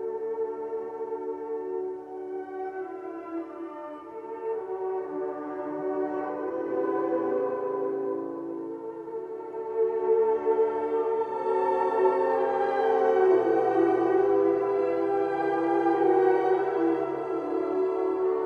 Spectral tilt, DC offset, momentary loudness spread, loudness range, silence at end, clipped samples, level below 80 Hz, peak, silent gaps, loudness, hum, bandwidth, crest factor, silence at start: -7.5 dB/octave; under 0.1%; 13 LU; 11 LU; 0 s; under 0.1%; -70 dBFS; -10 dBFS; none; -27 LUFS; none; 4.9 kHz; 16 dB; 0 s